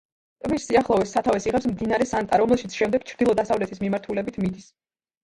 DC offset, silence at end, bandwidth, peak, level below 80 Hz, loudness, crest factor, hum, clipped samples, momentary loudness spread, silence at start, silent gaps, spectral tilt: under 0.1%; 0.6 s; 11.5 kHz; -4 dBFS; -50 dBFS; -23 LUFS; 18 dB; none; under 0.1%; 8 LU; 0.45 s; none; -5.5 dB/octave